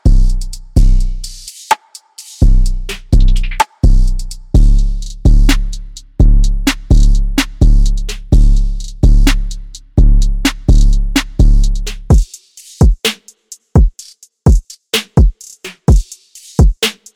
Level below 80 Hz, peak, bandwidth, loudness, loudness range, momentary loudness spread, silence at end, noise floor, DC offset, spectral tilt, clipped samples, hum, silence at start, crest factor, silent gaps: -10 dBFS; 0 dBFS; 14.5 kHz; -14 LUFS; 2 LU; 14 LU; 0.25 s; -39 dBFS; under 0.1%; -5.5 dB/octave; under 0.1%; none; 0.05 s; 10 dB; none